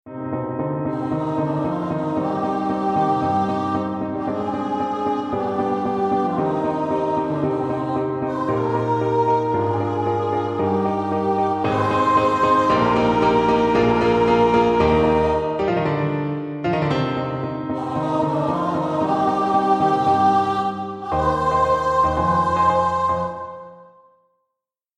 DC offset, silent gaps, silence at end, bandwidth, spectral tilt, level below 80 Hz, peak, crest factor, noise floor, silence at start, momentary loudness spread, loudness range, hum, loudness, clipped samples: under 0.1%; none; 1.15 s; 10.5 kHz; -7.5 dB/octave; -44 dBFS; -4 dBFS; 16 dB; -82 dBFS; 0.05 s; 8 LU; 5 LU; none; -20 LUFS; under 0.1%